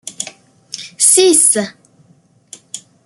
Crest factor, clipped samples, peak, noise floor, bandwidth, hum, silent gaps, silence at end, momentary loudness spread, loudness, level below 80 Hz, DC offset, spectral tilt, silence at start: 16 dB; under 0.1%; 0 dBFS; -52 dBFS; over 20 kHz; none; none; 0.3 s; 23 LU; -9 LUFS; -68 dBFS; under 0.1%; -1.5 dB/octave; 0.05 s